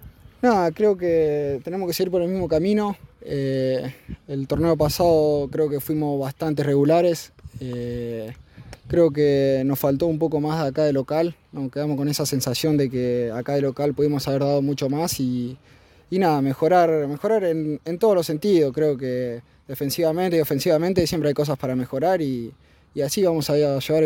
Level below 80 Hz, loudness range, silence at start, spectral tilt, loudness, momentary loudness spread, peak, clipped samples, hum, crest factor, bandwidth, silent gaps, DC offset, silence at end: -50 dBFS; 2 LU; 0 s; -6 dB/octave; -22 LUFS; 11 LU; -6 dBFS; under 0.1%; none; 16 dB; 17 kHz; none; under 0.1%; 0 s